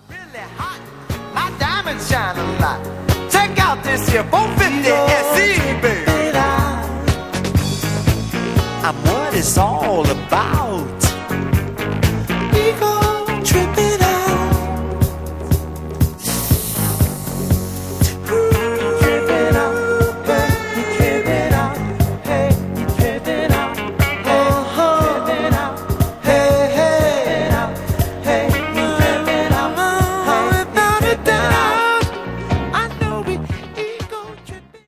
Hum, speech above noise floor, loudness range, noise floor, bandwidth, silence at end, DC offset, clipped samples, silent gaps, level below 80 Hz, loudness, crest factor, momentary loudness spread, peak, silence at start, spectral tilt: none; 21 dB; 3 LU; -37 dBFS; 16 kHz; 0.1 s; 0.2%; under 0.1%; none; -28 dBFS; -17 LUFS; 16 dB; 8 LU; 0 dBFS; 0.1 s; -5 dB/octave